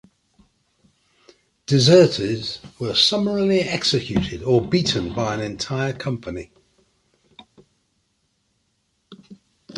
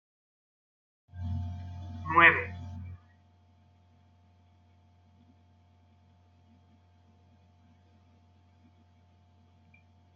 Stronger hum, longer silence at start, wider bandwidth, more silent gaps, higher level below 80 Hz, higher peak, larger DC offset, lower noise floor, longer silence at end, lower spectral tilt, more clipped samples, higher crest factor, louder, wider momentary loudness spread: neither; first, 1.7 s vs 1.15 s; first, 11.5 kHz vs 6.8 kHz; neither; first, -48 dBFS vs -68 dBFS; first, -2 dBFS vs -6 dBFS; neither; first, -69 dBFS vs -62 dBFS; second, 0 s vs 7.2 s; second, -5 dB/octave vs -7 dB/octave; neither; second, 20 dB vs 28 dB; first, -20 LUFS vs -26 LUFS; second, 16 LU vs 28 LU